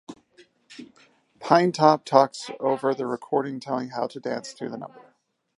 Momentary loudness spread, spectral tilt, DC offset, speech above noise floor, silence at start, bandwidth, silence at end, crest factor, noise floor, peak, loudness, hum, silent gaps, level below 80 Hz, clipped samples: 20 LU; -5.5 dB/octave; under 0.1%; 42 dB; 0.1 s; 11.5 kHz; 0.6 s; 24 dB; -65 dBFS; -2 dBFS; -24 LUFS; none; none; -78 dBFS; under 0.1%